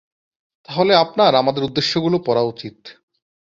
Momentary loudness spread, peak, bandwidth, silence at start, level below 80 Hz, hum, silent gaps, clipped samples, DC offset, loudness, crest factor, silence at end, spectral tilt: 12 LU; -2 dBFS; 7.6 kHz; 0.7 s; -60 dBFS; none; none; under 0.1%; under 0.1%; -17 LUFS; 18 dB; 0.7 s; -5.5 dB/octave